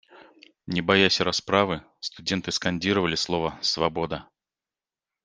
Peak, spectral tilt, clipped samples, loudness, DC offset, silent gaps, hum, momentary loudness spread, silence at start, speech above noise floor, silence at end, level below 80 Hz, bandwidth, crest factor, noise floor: -2 dBFS; -4 dB/octave; under 0.1%; -24 LUFS; under 0.1%; none; none; 12 LU; 0.15 s; over 65 dB; 1 s; -58 dBFS; 10 kHz; 24 dB; under -90 dBFS